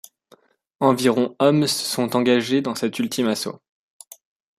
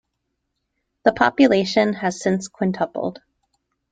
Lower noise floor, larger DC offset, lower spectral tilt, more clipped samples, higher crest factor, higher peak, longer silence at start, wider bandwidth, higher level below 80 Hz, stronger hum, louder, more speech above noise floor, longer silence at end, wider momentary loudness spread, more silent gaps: second, -56 dBFS vs -76 dBFS; neither; about the same, -4.5 dB/octave vs -5.5 dB/octave; neither; about the same, 18 dB vs 20 dB; about the same, -4 dBFS vs -2 dBFS; second, 0.8 s vs 1.05 s; first, 15.5 kHz vs 9.2 kHz; second, -66 dBFS vs -58 dBFS; neither; about the same, -20 LUFS vs -20 LUFS; second, 36 dB vs 57 dB; first, 1.05 s vs 0.8 s; about the same, 7 LU vs 9 LU; neither